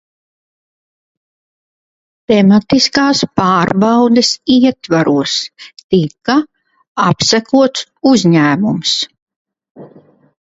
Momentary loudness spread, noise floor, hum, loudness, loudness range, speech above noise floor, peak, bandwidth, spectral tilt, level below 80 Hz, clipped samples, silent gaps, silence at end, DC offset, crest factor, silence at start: 6 LU; under -90 dBFS; none; -12 LUFS; 3 LU; over 78 dB; 0 dBFS; 8 kHz; -5 dB/octave; -50 dBFS; under 0.1%; 5.84-5.89 s, 6.88-6.95 s, 9.22-9.27 s, 9.36-9.45 s, 9.70-9.75 s; 0.6 s; under 0.1%; 14 dB; 2.3 s